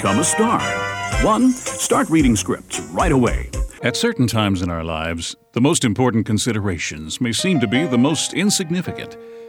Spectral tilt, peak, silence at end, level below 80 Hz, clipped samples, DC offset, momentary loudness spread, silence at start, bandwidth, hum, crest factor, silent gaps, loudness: -4.5 dB/octave; -2 dBFS; 0 s; -32 dBFS; under 0.1%; under 0.1%; 9 LU; 0 s; 19.5 kHz; none; 18 dB; none; -19 LUFS